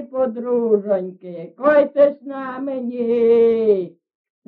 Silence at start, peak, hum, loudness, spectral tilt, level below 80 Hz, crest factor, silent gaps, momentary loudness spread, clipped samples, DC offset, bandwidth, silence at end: 0 s; -4 dBFS; none; -18 LUFS; -6 dB/octave; -66 dBFS; 14 dB; none; 16 LU; under 0.1%; under 0.1%; 4.5 kHz; 0.6 s